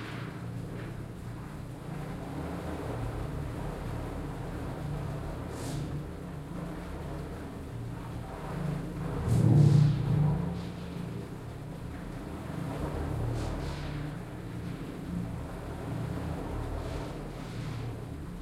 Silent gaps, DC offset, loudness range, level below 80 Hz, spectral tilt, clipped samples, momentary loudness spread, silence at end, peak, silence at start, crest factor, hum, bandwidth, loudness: none; under 0.1%; 10 LU; -44 dBFS; -7.5 dB/octave; under 0.1%; 13 LU; 0 s; -12 dBFS; 0 s; 22 dB; none; 14 kHz; -34 LUFS